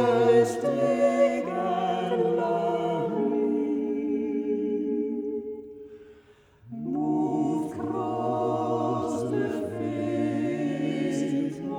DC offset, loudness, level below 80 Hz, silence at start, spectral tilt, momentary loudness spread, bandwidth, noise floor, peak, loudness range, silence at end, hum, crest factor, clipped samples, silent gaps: under 0.1%; -27 LUFS; -66 dBFS; 0 s; -7 dB/octave; 8 LU; 11.5 kHz; -56 dBFS; -8 dBFS; 5 LU; 0 s; none; 18 dB; under 0.1%; none